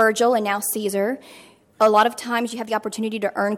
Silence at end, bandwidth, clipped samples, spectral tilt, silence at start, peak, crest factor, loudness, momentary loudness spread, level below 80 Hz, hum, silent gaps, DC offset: 0 s; 17 kHz; under 0.1%; -3.5 dB/octave; 0 s; -4 dBFS; 16 dB; -21 LUFS; 9 LU; -72 dBFS; none; none; under 0.1%